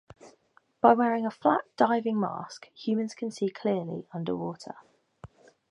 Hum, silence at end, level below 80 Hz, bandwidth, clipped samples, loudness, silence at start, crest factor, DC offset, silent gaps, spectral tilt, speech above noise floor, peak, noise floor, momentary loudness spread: none; 0.45 s; -70 dBFS; 10.5 kHz; under 0.1%; -28 LUFS; 0.25 s; 24 dB; under 0.1%; none; -6.5 dB/octave; 37 dB; -4 dBFS; -65 dBFS; 16 LU